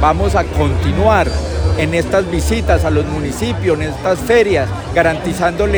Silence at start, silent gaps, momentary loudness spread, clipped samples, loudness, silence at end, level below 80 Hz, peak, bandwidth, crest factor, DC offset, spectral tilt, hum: 0 s; none; 5 LU; under 0.1%; -15 LUFS; 0 s; -24 dBFS; 0 dBFS; over 20 kHz; 14 dB; under 0.1%; -6 dB/octave; none